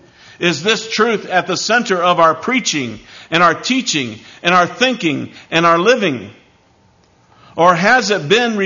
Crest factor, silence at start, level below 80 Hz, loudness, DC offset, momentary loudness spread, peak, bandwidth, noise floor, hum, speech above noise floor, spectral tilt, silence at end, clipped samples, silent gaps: 16 dB; 0.4 s; -58 dBFS; -14 LUFS; under 0.1%; 8 LU; 0 dBFS; 7.4 kHz; -52 dBFS; none; 38 dB; -3.5 dB/octave; 0 s; under 0.1%; none